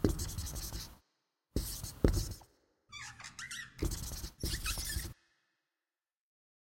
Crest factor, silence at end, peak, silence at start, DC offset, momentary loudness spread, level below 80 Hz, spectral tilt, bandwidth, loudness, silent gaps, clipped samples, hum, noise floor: 28 dB; 1.6 s; -12 dBFS; 0 s; under 0.1%; 14 LU; -44 dBFS; -4.5 dB/octave; 16.5 kHz; -39 LUFS; none; under 0.1%; none; under -90 dBFS